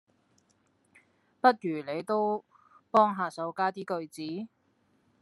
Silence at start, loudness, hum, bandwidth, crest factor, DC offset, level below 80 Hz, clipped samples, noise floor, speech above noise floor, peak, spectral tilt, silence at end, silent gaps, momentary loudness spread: 1.45 s; -29 LUFS; none; 12.5 kHz; 24 dB; under 0.1%; -86 dBFS; under 0.1%; -70 dBFS; 42 dB; -6 dBFS; -6 dB/octave; 0.75 s; none; 13 LU